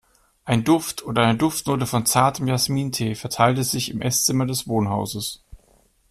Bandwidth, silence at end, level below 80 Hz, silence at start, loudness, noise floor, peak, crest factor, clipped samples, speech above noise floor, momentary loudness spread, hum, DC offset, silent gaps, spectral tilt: 15.5 kHz; 0.55 s; -50 dBFS; 0.45 s; -21 LUFS; -59 dBFS; -4 dBFS; 18 dB; under 0.1%; 38 dB; 7 LU; none; under 0.1%; none; -4.5 dB/octave